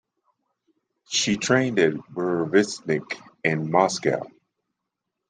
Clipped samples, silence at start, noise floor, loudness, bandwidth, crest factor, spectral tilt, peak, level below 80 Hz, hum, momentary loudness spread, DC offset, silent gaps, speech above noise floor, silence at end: under 0.1%; 1.1 s; -83 dBFS; -23 LUFS; 9.8 kHz; 22 dB; -4 dB/octave; -4 dBFS; -66 dBFS; none; 8 LU; under 0.1%; none; 60 dB; 1 s